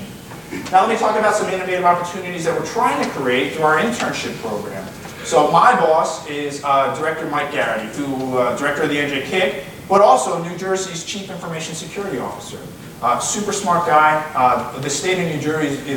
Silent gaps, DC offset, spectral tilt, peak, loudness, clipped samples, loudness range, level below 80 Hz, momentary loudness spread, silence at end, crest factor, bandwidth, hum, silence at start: none; under 0.1%; -4 dB/octave; 0 dBFS; -18 LUFS; under 0.1%; 3 LU; -52 dBFS; 13 LU; 0 s; 18 dB; 19 kHz; none; 0 s